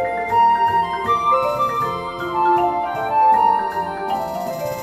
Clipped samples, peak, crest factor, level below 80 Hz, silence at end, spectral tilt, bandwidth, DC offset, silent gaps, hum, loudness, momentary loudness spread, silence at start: under 0.1%; -6 dBFS; 12 dB; -50 dBFS; 0 s; -5 dB/octave; 14.5 kHz; under 0.1%; none; none; -18 LUFS; 9 LU; 0 s